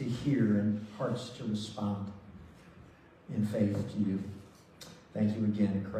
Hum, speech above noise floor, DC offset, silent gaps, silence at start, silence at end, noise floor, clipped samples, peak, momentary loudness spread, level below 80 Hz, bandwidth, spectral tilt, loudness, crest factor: none; 25 dB; under 0.1%; none; 0 s; 0 s; -56 dBFS; under 0.1%; -18 dBFS; 22 LU; -64 dBFS; 10 kHz; -7.5 dB/octave; -33 LUFS; 16 dB